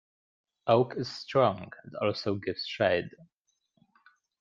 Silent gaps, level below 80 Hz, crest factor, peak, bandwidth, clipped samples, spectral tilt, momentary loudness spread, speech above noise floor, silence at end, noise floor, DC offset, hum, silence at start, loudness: none; -70 dBFS; 20 dB; -10 dBFS; 7.4 kHz; under 0.1%; -6.5 dB/octave; 13 LU; 42 dB; 1.15 s; -71 dBFS; under 0.1%; none; 0.65 s; -29 LUFS